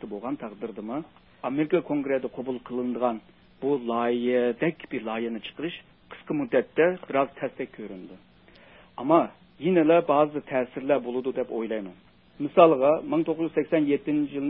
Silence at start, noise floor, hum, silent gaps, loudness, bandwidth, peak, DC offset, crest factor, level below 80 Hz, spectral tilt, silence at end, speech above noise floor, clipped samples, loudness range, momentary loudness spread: 0 s; -54 dBFS; none; none; -26 LUFS; 4 kHz; -4 dBFS; under 0.1%; 22 dB; -66 dBFS; -10.5 dB/octave; 0 s; 28 dB; under 0.1%; 5 LU; 16 LU